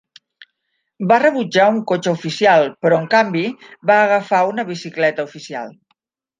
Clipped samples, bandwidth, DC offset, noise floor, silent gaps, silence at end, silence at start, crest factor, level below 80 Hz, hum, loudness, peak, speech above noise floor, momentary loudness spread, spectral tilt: under 0.1%; 9.4 kHz; under 0.1%; -72 dBFS; none; 0.7 s; 1 s; 16 dB; -68 dBFS; none; -16 LUFS; 0 dBFS; 56 dB; 13 LU; -5.5 dB/octave